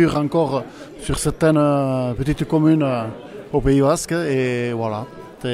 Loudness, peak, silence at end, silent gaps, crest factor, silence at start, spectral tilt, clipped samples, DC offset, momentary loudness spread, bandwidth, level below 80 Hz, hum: -19 LUFS; -4 dBFS; 0 s; none; 16 dB; 0 s; -6.5 dB/octave; under 0.1%; under 0.1%; 14 LU; 14 kHz; -38 dBFS; none